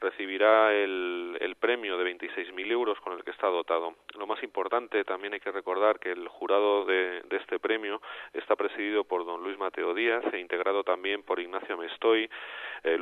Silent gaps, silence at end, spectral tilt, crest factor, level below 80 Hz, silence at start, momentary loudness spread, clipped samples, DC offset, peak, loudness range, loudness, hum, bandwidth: none; 0 s; -4.5 dB/octave; 22 dB; -78 dBFS; 0 s; 10 LU; under 0.1%; under 0.1%; -8 dBFS; 3 LU; -29 LUFS; none; 4.2 kHz